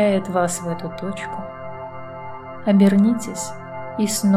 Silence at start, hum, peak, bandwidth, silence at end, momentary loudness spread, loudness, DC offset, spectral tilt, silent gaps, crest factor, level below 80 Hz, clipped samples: 0 s; none; -6 dBFS; 15 kHz; 0 s; 19 LU; -21 LUFS; 0.7%; -6 dB/octave; none; 16 dB; -56 dBFS; under 0.1%